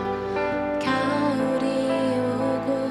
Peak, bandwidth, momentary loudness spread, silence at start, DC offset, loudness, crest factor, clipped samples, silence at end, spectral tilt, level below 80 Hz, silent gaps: -10 dBFS; 12 kHz; 3 LU; 0 s; under 0.1%; -24 LUFS; 14 dB; under 0.1%; 0 s; -6 dB/octave; -54 dBFS; none